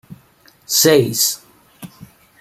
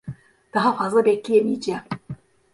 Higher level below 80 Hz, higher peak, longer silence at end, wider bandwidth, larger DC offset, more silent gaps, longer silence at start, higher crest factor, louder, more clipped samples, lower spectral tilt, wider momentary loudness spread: about the same, -58 dBFS vs -62 dBFS; first, 0 dBFS vs -6 dBFS; about the same, 0.35 s vs 0.4 s; first, 16 kHz vs 11.5 kHz; neither; neither; about the same, 0.1 s vs 0.05 s; about the same, 18 dB vs 16 dB; first, -14 LUFS vs -21 LUFS; neither; second, -3 dB/octave vs -6 dB/octave; second, 7 LU vs 20 LU